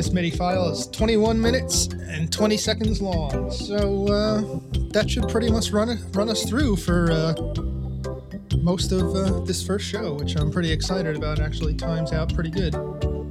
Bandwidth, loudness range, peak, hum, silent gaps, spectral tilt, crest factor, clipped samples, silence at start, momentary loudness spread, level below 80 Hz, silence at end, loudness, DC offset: 15.5 kHz; 3 LU; -6 dBFS; none; none; -5 dB/octave; 16 dB; under 0.1%; 0 s; 7 LU; -32 dBFS; 0 s; -23 LUFS; under 0.1%